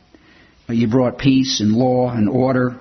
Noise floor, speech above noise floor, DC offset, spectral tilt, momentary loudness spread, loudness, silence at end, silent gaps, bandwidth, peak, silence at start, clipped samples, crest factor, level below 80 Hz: -50 dBFS; 34 dB; under 0.1%; -6 dB/octave; 2 LU; -17 LUFS; 0 s; none; 6.4 kHz; -2 dBFS; 0.7 s; under 0.1%; 14 dB; -46 dBFS